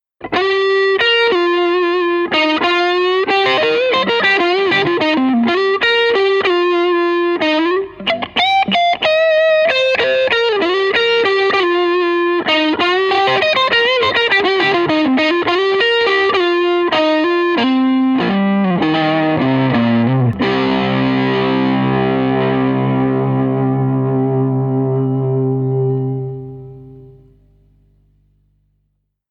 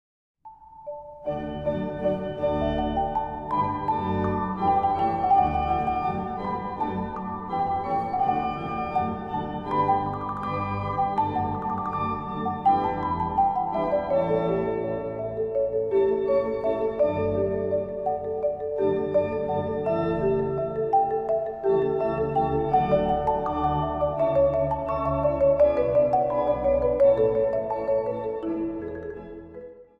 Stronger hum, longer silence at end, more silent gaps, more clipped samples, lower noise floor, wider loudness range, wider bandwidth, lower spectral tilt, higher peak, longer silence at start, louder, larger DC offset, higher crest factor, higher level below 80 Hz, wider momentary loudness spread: first, 50 Hz at -50 dBFS vs none; first, 2.2 s vs 0.15 s; neither; neither; first, -67 dBFS vs -47 dBFS; about the same, 4 LU vs 4 LU; first, 7.4 kHz vs 5.6 kHz; second, -6.5 dB/octave vs -9.5 dB/octave; first, -2 dBFS vs -8 dBFS; second, 0.2 s vs 0.45 s; first, -14 LUFS vs -25 LUFS; neither; about the same, 12 dB vs 16 dB; second, -52 dBFS vs -44 dBFS; second, 5 LU vs 8 LU